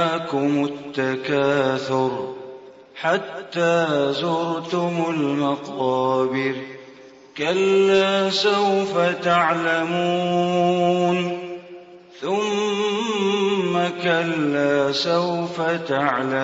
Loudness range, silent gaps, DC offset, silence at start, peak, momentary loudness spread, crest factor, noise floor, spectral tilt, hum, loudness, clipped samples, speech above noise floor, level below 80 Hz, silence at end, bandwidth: 4 LU; none; under 0.1%; 0 s; -6 dBFS; 9 LU; 16 dB; -45 dBFS; -5.5 dB/octave; none; -21 LUFS; under 0.1%; 24 dB; -66 dBFS; 0 s; 8 kHz